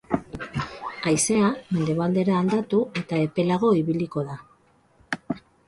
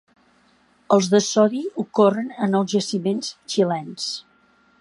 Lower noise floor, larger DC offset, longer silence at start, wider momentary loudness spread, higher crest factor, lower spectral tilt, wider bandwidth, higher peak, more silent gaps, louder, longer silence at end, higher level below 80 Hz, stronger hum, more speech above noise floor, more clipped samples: about the same, -60 dBFS vs -59 dBFS; neither; second, 0.1 s vs 0.9 s; about the same, 13 LU vs 11 LU; about the same, 18 dB vs 20 dB; about the same, -5.5 dB/octave vs -5 dB/octave; about the same, 11.5 kHz vs 11.5 kHz; second, -6 dBFS vs -2 dBFS; neither; second, -24 LUFS vs -21 LUFS; second, 0.3 s vs 0.6 s; first, -54 dBFS vs -70 dBFS; neither; about the same, 37 dB vs 39 dB; neither